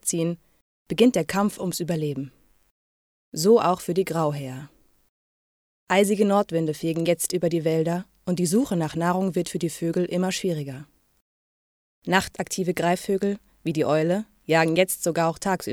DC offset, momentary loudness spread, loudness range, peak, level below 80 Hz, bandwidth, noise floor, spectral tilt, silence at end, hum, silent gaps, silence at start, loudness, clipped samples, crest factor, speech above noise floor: under 0.1%; 11 LU; 4 LU; -4 dBFS; -60 dBFS; 17 kHz; under -90 dBFS; -5 dB/octave; 0 s; none; 0.61-0.86 s, 2.71-3.32 s, 5.09-5.87 s, 11.21-12.02 s; 0.05 s; -24 LUFS; under 0.1%; 20 dB; over 67 dB